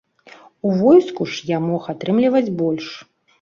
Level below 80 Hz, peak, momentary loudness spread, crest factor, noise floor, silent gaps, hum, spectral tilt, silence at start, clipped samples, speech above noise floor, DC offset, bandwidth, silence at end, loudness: -62 dBFS; -2 dBFS; 13 LU; 16 dB; -46 dBFS; none; none; -7 dB/octave; 0.65 s; under 0.1%; 29 dB; under 0.1%; 7.2 kHz; 0.4 s; -18 LUFS